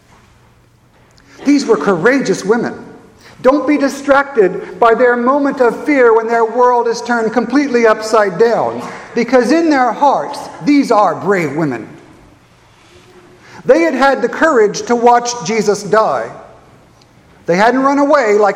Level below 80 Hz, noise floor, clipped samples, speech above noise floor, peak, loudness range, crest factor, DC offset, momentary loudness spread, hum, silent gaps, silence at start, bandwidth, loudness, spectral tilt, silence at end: -52 dBFS; -48 dBFS; 0.1%; 37 dB; 0 dBFS; 4 LU; 14 dB; under 0.1%; 9 LU; none; none; 1.4 s; 13 kHz; -12 LUFS; -5 dB/octave; 0 s